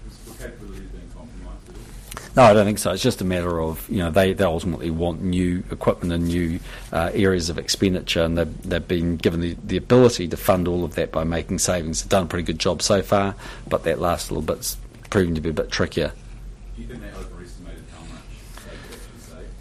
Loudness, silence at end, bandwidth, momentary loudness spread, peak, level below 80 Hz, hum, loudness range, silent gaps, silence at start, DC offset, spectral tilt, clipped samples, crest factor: -21 LUFS; 0 s; 15.5 kHz; 22 LU; -4 dBFS; -38 dBFS; none; 7 LU; none; 0 s; under 0.1%; -5 dB/octave; under 0.1%; 18 dB